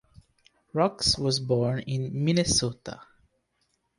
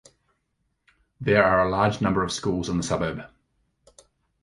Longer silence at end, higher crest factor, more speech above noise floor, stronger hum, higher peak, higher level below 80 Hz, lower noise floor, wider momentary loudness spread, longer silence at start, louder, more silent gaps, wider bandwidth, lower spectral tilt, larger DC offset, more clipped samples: second, 0.95 s vs 1.15 s; about the same, 20 dB vs 22 dB; second, 48 dB vs 52 dB; neither; second, -10 dBFS vs -4 dBFS; about the same, -50 dBFS vs -48 dBFS; about the same, -74 dBFS vs -74 dBFS; first, 15 LU vs 11 LU; second, 0.75 s vs 1.2 s; second, -26 LUFS vs -23 LUFS; neither; about the same, 11.5 kHz vs 11.5 kHz; about the same, -4.5 dB/octave vs -5.5 dB/octave; neither; neither